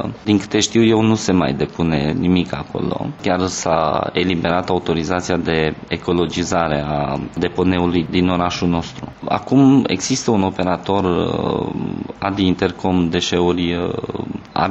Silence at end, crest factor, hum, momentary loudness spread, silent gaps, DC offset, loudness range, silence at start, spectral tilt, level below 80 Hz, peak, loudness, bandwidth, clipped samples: 0 s; 14 dB; none; 9 LU; none; under 0.1%; 2 LU; 0 s; -5.5 dB/octave; -42 dBFS; -4 dBFS; -18 LUFS; 8.2 kHz; under 0.1%